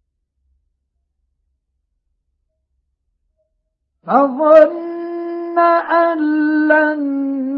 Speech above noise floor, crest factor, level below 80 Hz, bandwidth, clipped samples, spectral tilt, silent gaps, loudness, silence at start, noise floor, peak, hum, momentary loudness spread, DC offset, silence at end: 58 dB; 16 dB; -66 dBFS; 5.4 kHz; under 0.1%; -7.5 dB/octave; none; -14 LUFS; 4.05 s; -71 dBFS; 0 dBFS; none; 14 LU; under 0.1%; 0 s